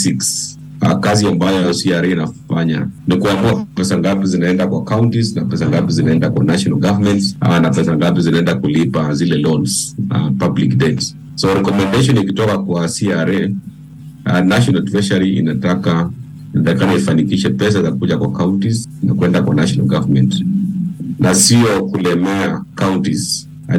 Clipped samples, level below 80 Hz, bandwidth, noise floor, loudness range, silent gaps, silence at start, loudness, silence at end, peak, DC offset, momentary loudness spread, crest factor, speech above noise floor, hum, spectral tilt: under 0.1%; -44 dBFS; 17 kHz; -34 dBFS; 2 LU; none; 0 s; -15 LUFS; 0 s; 0 dBFS; under 0.1%; 6 LU; 14 dB; 20 dB; none; -5.5 dB/octave